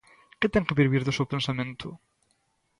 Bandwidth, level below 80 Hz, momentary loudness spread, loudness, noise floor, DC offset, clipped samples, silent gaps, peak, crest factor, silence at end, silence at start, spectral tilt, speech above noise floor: 11 kHz; -52 dBFS; 13 LU; -26 LUFS; -72 dBFS; under 0.1%; under 0.1%; none; -8 dBFS; 20 dB; 0.85 s; 0.4 s; -6.5 dB/octave; 46 dB